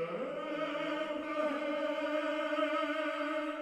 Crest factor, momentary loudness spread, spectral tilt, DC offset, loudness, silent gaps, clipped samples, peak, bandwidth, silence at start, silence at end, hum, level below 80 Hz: 14 dB; 4 LU; -4.5 dB/octave; under 0.1%; -35 LUFS; none; under 0.1%; -20 dBFS; 12 kHz; 0 s; 0 s; none; -76 dBFS